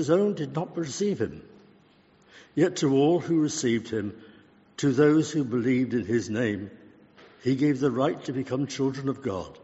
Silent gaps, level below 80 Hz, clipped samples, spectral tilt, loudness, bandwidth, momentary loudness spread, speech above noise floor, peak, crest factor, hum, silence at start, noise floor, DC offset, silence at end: none; -64 dBFS; under 0.1%; -6.5 dB/octave; -26 LUFS; 8 kHz; 11 LU; 34 dB; -8 dBFS; 18 dB; none; 0 s; -59 dBFS; under 0.1%; 0.1 s